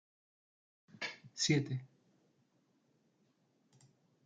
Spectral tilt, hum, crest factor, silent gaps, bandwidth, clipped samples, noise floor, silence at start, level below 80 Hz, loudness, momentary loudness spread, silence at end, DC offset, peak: -4 dB/octave; none; 24 dB; none; 9.4 kHz; under 0.1%; -76 dBFS; 1 s; -80 dBFS; -37 LUFS; 12 LU; 2.4 s; under 0.1%; -20 dBFS